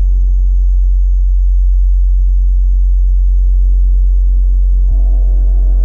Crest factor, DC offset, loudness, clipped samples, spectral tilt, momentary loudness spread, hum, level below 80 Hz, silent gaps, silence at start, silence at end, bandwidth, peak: 4 dB; under 0.1%; -14 LUFS; under 0.1%; -10.5 dB/octave; 1 LU; none; -8 dBFS; none; 0 s; 0 s; 0.8 kHz; -4 dBFS